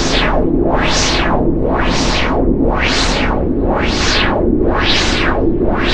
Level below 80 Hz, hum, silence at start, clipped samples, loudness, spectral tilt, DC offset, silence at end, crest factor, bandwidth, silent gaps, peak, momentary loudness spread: -20 dBFS; none; 0 s; under 0.1%; -14 LUFS; -4.5 dB/octave; under 0.1%; 0 s; 12 dB; 9.8 kHz; none; 0 dBFS; 3 LU